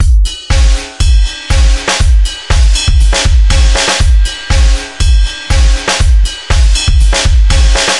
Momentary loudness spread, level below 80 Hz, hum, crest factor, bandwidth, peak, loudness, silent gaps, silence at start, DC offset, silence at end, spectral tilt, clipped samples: 4 LU; -8 dBFS; none; 8 dB; 11.5 kHz; 0 dBFS; -11 LUFS; none; 0 s; 0.8%; 0 s; -3.5 dB/octave; under 0.1%